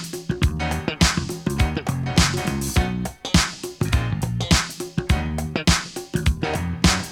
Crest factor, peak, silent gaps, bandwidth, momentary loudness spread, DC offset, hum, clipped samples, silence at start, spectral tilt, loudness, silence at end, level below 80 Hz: 20 dB; -2 dBFS; none; 18 kHz; 7 LU; under 0.1%; none; under 0.1%; 0 s; -4 dB/octave; -22 LUFS; 0 s; -28 dBFS